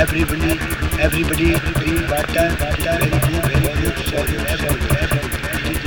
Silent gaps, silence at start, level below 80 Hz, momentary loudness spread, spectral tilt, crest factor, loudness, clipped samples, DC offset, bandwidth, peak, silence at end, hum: none; 0 s; -24 dBFS; 4 LU; -5 dB/octave; 16 dB; -18 LUFS; under 0.1%; 0.2%; 19.5 kHz; -2 dBFS; 0 s; none